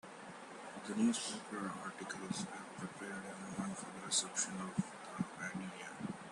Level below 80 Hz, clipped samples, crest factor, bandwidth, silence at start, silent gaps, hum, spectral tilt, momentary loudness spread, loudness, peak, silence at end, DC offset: -78 dBFS; under 0.1%; 22 dB; 12.5 kHz; 0.05 s; none; none; -3 dB/octave; 13 LU; -41 LUFS; -20 dBFS; 0 s; under 0.1%